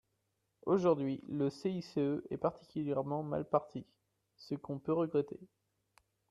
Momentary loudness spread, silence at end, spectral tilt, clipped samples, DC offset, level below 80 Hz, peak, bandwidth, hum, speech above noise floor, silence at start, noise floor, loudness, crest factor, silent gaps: 13 LU; 0.85 s; -8.5 dB/octave; under 0.1%; under 0.1%; -72 dBFS; -16 dBFS; 11 kHz; none; 47 dB; 0.65 s; -82 dBFS; -36 LUFS; 22 dB; none